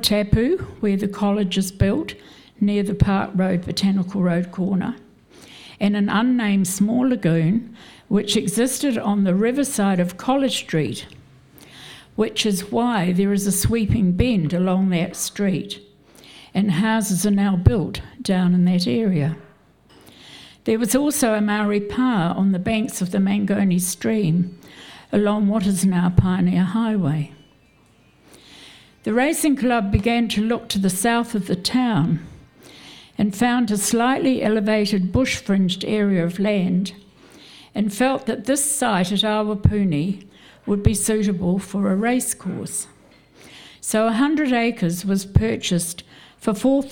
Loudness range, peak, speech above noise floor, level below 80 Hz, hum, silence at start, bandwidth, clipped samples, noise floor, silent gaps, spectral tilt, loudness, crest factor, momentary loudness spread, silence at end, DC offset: 3 LU; -2 dBFS; 35 dB; -40 dBFS; none; 0 s; 18 kHz; under 0.1%; -55 dBFS; none; -5.5 dB/octave; -20 LUFS; 18 dB; 9 LU; 0 s; under 0.1%